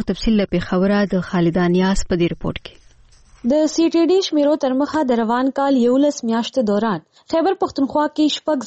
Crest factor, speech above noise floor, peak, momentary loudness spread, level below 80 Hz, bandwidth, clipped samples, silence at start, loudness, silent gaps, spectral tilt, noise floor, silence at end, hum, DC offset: 10 dB; 31 dB; -8 dBFS; 5 LU; -38 dBFS; 8.4 kHz; under 0.1%; 0 s; -18 LUFS; none; -6 dB/octave; -48 dBFS; 0 s; none; under 0.1%